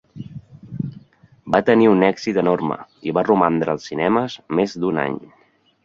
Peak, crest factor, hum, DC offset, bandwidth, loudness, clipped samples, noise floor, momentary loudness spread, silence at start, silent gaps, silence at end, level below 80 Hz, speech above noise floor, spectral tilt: -2 dBFS; 18 dB; none; under 0.1%; 7.6 kHz; -19 LUFS; under 0.1%; -49 dBFS; 19 LU; 0.15 s; none; 0.6 s; -56 dBFS; 30 dB; -7 dB/octave